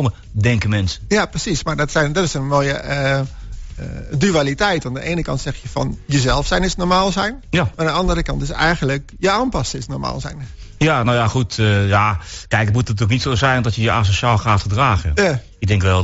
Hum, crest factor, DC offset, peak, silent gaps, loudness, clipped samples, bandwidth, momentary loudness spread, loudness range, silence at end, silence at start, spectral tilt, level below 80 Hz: none; 14 dB; under 0.1%; -2 dBFS; none; -18 LUFS; under 0.1%; 8 kHz; 9 LU; 3 LU; 0 s; 0 s; -4.5 dB/octave; -32 dBFS